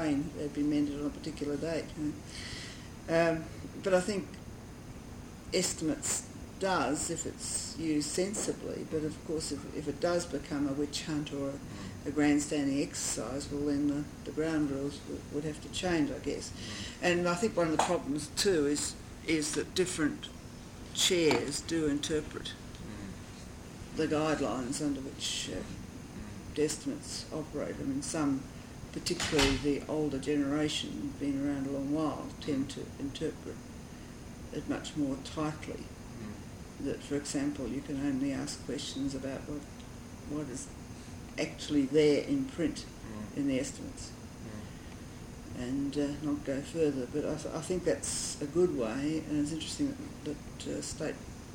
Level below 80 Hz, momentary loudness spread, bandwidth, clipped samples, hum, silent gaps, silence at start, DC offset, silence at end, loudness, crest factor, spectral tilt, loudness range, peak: -52 dBFS; 15 LU; 17 kHz; under 0.1%; none; none; 0 s; under 0.1%; 0 s; -34 LUFS; 22 dB; -4 dB/octave; 6 LU; -12 dBFS